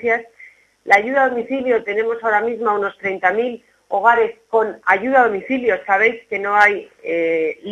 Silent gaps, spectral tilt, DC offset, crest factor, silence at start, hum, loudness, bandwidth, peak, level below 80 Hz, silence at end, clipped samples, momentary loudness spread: none; -5 dB/octave; under 0.1%; 18 dB; 0 s; none; -17 LUFS; 9.8 kHz; 0 dBFS; -62 dBFS; 0 s; under 0.1%; 9 LU